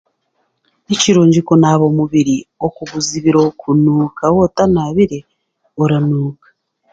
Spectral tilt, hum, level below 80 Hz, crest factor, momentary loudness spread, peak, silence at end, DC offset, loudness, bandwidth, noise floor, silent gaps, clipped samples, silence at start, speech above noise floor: -6 dB/octave; none; -46 dBFS; 14 dB; 10 LU; 0 dBFS; 0.6 s; under 0.1%; -14 LUFS; 9.2 kHz; -66 dBFS; none; under 0.1%; 0.9 s; 53 dB